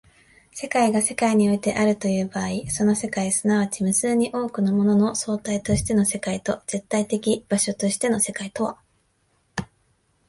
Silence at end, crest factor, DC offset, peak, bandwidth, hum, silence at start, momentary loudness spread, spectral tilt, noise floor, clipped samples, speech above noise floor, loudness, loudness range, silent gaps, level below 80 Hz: 0.65 s; 16 dB; under 0.1%; -8 dBFS; 12 kHz; none; 0.55 s; 8 LU; -4.5 dB/octave; -66 dBFS; under 0.1%; 44 dB; -22 LUFS; 3 LU; none; -50 dBFS